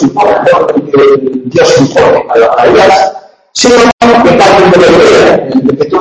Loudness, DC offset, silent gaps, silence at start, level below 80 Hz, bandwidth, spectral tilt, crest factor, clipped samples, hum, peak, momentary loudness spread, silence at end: -5 LUFS; under 0.1%; 3.93-3.98 s; 0 s; -36 dBFS; 11 kHz; -4.5 dB/octave; 6 dB; 4%; none; 0 dBFS; 6 LU; 0 s